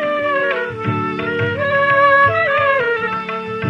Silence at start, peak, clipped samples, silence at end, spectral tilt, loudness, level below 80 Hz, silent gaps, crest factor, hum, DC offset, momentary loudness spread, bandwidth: 0 s; -2 dBFS; under 0.1%; 0 s; -7 dB/octave; -16 LUFS; -54 dBFS; none; 14 dB; none; under 0.1%; 10 LU; 7.4 kHz